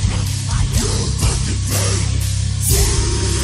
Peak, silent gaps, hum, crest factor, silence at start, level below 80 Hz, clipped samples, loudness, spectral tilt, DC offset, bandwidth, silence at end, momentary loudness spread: -2 dBFS; none; none; 14 dB; 0 s; -22 dBFS; under 0.1%; -18 LUFS; -4 dB/octave; under 0.1%; 15.5 kHz; 0 s; 4 LU